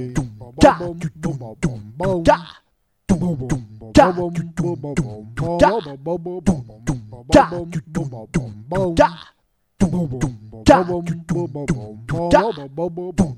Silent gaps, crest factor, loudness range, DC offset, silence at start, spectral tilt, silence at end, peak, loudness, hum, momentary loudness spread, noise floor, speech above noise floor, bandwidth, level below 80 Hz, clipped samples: none; 20 dB; 2 LU; under 0.1%; 0 s; -6.5 dB/octave; 0 s; 0 dBFS; -20 LUFS; none; 13 LU; -38 dBFS; 19 dB; 12.5 kHz; -36 dBFS; under 0.1%